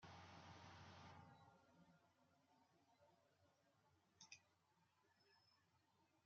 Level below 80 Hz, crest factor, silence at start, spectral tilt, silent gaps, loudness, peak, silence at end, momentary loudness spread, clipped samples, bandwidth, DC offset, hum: under -90 dBFS; 24 dB; 0 s; -3.5 dB/octave; none; -64 LUFS; -46 dBFS; 0 s; 4 LU; under 0.1%; 7 kHz; under 0.1%; none